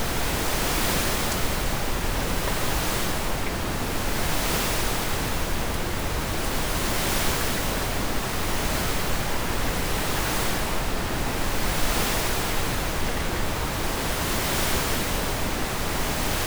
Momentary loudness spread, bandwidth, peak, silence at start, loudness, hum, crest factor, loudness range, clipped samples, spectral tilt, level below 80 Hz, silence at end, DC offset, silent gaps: 4 LU; over 20 kHz; -10 dBFS; 0 s; -26 LUFS; none; 14 dB; 1 LU; under 0.1%; -3.5 dB/octave; -30 dBFS; 0 s; under 0.1%; none